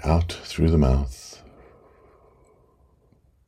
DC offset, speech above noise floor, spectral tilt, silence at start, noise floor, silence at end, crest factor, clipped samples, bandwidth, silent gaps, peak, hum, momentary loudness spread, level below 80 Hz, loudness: under 0.1%; 39 dB; -7 dB/octave; 0 s; -60 dBFS; 2.15 s; 20 dB; under 0.1%; 12 kHz; none; -4 dBFS; none; 22 LU; -30 dBFS; -23 LUFS